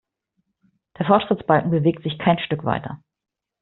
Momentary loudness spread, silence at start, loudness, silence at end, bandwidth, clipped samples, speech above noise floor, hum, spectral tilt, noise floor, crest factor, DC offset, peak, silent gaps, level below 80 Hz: 10 LU; 1 s; -21 LUFS; 0.65 s; 4.2 kHz; under 0.1%; 66 dB; none; -5.5 dB/octave; -86 dBFS; 20 dB; under 0.1%; -2 dBFS; none; -56 dBFS